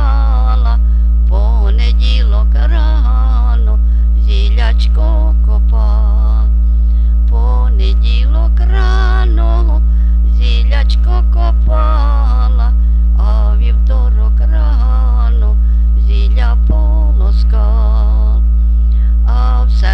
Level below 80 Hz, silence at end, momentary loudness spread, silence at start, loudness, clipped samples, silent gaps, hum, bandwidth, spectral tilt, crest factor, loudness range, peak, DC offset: -8 dBFS; 0 s; 0 LU; 0 s; -13 LUFS; under 0.1%; none; none; 5.4 kHz; -8 dB/octave; 8 dB; 0 LU; 0 dBFS; under 0.1%